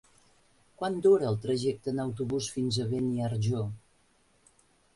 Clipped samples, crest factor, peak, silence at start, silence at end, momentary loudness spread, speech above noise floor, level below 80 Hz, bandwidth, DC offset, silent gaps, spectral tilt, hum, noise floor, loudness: under 0.1%; 18 dB; -12 dBFS; 0.8 s; 1.15 s; 10 LU; 38 dB; -62 dBFS; 11.5 kHz; under 0.1%; none; -6.5 dB/octave; none; -66 dBFS; -30 LUFS